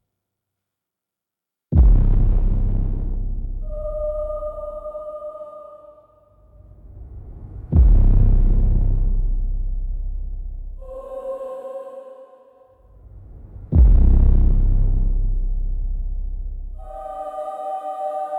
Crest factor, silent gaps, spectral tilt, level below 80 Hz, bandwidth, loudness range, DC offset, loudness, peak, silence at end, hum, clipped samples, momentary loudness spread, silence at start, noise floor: 16 dB; none; -11.5 dB/octave; -20 dBFS; 1.6 kHz; 13 LU; under 0.1%; -23 LUFS; -2 dBFS; 0 s; none; under 0.1%; 21 LU; 1.7 s; -86 dBFS